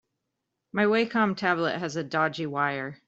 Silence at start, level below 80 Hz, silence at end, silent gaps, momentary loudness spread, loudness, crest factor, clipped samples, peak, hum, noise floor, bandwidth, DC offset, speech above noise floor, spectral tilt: 0.75 s; -70 dBFS; 0.1 s; none; 6 LU; -26 LUFS; 18 dB; under 0.1%; -8 dBFS; none; -82 dBFS; 8 kHz; under 0.1%; 56 dB; -5.5 dB/octave